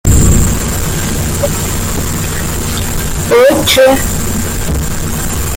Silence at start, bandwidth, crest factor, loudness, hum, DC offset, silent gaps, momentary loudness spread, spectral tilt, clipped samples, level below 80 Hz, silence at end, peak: 0.05 s; 17 kHz; 12 dB; -12 LUFS; none; under 0.1%; none; 9 LU; -4 dB/octave; under 0.1%; -18 dBFS; 0 s; 0 dBFS